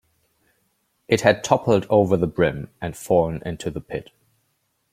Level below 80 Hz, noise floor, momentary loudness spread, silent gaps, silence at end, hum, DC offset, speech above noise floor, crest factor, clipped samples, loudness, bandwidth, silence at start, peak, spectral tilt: -50 dBFS; -70 dBFS; 14 LU; none; 0.9 s; none; under 0.1%; 50 dB; 22 dB; under 0.1%; -21 LUFS; 15.5 kHz; 1.1 s; -2 dBFS; -6 dB/octave